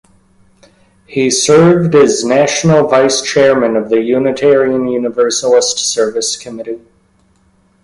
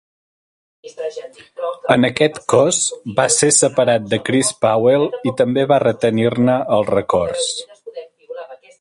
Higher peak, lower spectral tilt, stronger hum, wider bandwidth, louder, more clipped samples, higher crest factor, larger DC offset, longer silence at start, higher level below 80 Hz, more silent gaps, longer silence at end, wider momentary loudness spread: about the same, 0 dBFS vs 0 dBFS; about the same, -4 dB/octave vs -4 dB/octave; neither; about the same, 11.5 kHz vs 11.5 kHz; first, -11 LUFS vs -16 LUFS; neither; second, 12 dB vs 18 dB; neither; first, 1.1 s vs 0.85 s; about the same, -50 dBFS vs -54 dBFS; neither; first, 1.05 s vs 0.25 s; second, 10 LU vs 20 LU